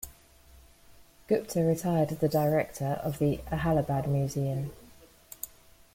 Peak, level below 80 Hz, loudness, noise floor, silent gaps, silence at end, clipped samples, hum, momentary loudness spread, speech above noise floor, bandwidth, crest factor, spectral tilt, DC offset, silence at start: -14 dBFS; -52 dBFS; -29 LUFS; -56 dBFS; none; 0.5 s; under 0.1%; none; 15 LU; 28 dB; 16.5 kHz; 16 dB; -7 dB/octave; under 0.1%; 0 s